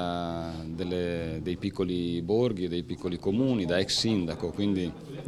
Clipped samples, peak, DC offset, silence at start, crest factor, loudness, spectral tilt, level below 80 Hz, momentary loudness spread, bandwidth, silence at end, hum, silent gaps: under 0.1%; -12 dBFS; under 0.1%; 0 s; 18 dB; -29 LUFS; -5.5 dB/octave; -54 dBFS; 8 LU; 13.5 kHz; 0 s; none; none